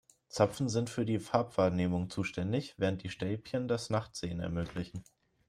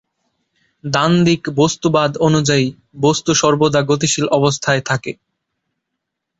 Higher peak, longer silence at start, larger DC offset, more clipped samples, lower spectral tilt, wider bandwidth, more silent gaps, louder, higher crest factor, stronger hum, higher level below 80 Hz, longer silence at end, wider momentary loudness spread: second, -12 dBFS vs -2 dBFS; second, 0.35 s vs 0.85 s; neither; neither; first, -6 dB/octave vs -4.5 dB/octave; first, 14.5 kHz vs 8 kHz; neither; second, -34 LUFS vs -15 LUFS; first, 22 dB vs 14 dB; neither; second, -60 dBFS vs -50 dBFS; second, 0.45 s vs 1.25 s; about the same, 9 LU vs 8 LU